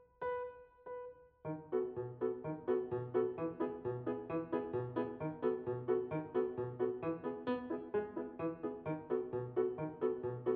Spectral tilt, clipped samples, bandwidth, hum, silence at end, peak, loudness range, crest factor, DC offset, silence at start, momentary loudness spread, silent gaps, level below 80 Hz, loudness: -8 dB/octave; under 0.1%; 4.3 kHz; none; 0 s; -22 dBFS; 1 LU; 16 dB; under 0.1%; 0 s; 7 LU; none; -72 dBFS; -40 LUFS